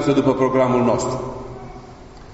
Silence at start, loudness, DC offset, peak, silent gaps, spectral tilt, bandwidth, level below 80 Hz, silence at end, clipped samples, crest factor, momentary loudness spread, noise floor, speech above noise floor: 0 s; -18 LUFS; under 0.1%; -2 dBFS; none; -6.5 dB/octave; 8 kHz; -42 dBFS; 0 s; under 0.1%; 18 dB; 20 LU; -40 dBFS; 22 dB